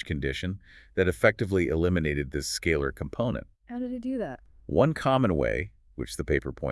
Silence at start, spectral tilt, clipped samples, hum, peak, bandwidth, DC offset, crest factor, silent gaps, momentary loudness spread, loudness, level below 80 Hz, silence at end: 0 s; -6 dB/octave; under 0.1%; none; -6 dBFS; 12 kHz; under 0.1%; 22 dB; none; 13 LU; -28 LUFS; -44 dBFS; 0 s